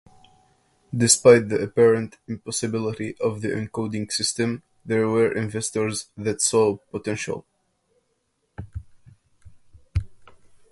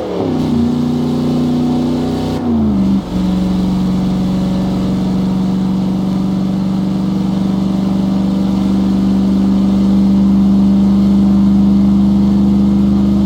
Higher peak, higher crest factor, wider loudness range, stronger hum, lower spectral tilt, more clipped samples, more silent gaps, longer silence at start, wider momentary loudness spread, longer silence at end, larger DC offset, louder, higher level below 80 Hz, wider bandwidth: about the same, 0 dBFS vs -2 dBFS; first, 24 dB vs 10 dB; first, 15 LU vs 4 LU; neither; second, -4 dB/octave vs -8.5 dB/octave; neither; neither; first, 0.9 s vs 0 s; first, 16 LU vs 5 LU; first, 0.45 s vs 0 s; neither; second, -22 LUFS vs -13 LUFS; second, -46 dBFS vs -30 dBFS; first, 11.5 kHz vs 8.6 kHz